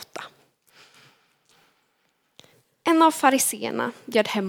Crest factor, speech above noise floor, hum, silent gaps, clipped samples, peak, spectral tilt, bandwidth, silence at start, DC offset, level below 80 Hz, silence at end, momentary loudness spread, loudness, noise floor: 22 dB; 48 dB; none; none; under 0.1%; -2 dBFS; -3 dB/octave; 19.5 kHz; 0 s; under 0.1%; -78 dBFS; 0 s; 21 LU; -21 LUFS; -70 dBFS